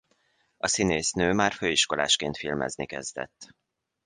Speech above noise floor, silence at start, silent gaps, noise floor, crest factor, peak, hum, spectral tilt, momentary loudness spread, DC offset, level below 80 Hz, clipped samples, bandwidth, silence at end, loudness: 42 dB; 0.65 s; none; -69 dBFS; 22 dB; -8 dBFS; none; -2.5 dB/octave; 11 LU; under 0.1%; -54 dBFS; under 0.1%; 11 kHz; 0.6 s; -26 LUFS